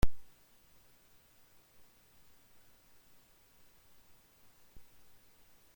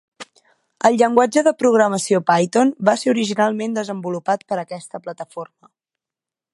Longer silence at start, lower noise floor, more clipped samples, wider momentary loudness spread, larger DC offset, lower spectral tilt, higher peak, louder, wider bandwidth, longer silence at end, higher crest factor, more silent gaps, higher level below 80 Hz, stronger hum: second, 0.05 s vs 0.2 s; second, -64 dBFS vs -89 dBFS; neither; second, 1 LU vs 16 LU; neither; about the same, -5.5 dB/octave vs -5 dB/octave; second, -14 dBFS vs 0 dBFS; second, -57 LUFS vs -18 LUFS; first, 16.5 kHz vs 11.5 kHz; first, 5.55 s vs 1.1 s; first, 24 dB vs 18 dB; neither; first, -48 dBFS vs -68 dBFS; neither